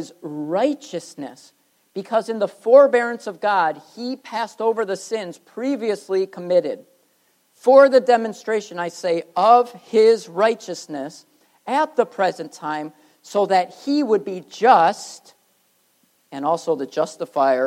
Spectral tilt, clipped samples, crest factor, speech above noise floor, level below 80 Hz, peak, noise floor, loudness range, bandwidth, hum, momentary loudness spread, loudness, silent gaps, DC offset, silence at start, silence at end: -4.5 dB/octave; under 0.1%; 20 dB; 44 dB; -84 dBFS; 0 dBFS; -63 dBFS; 6 LU; 13 kHz; none; 17 LU; -19 LUFS; none; under 0.1%; 0 s; 0 s